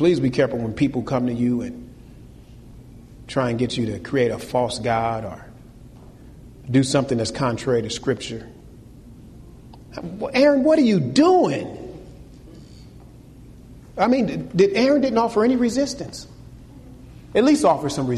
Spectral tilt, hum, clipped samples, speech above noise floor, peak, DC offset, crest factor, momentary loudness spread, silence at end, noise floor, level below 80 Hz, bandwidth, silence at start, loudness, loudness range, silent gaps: -6 dB/octave; none; under 0.1%; 24 dB; -6 dBFS; under 0.1%; 16 dB; 19 LU; 0 s; -44 dBFS; -48 dBFS; 13 kHz; 0 s; -20 LUFS; 6 LU; none